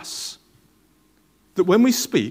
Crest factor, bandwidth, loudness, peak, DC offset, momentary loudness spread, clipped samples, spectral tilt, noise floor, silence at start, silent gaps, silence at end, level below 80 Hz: 18 dB; 16 kHz; -20 LUFS; -4 dBFS; under 0.1%; 14 LU; under 0.1%; -4 dB/octave; -60 dBFS; 0 s; none; 0 s; -66 dBFS